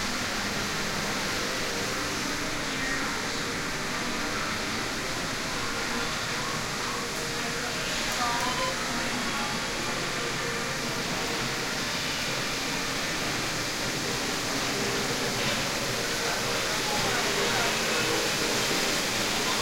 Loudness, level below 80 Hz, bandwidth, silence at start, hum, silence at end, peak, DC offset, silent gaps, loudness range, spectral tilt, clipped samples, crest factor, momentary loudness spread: -28 LUFS; -46 dBFS; 16 kHz; 0 s; none; 0 s; -14 dBFS; under 0.1%; none; 4 LU; -2 dB/octave; under 0.1%; 16 dB; 4 LU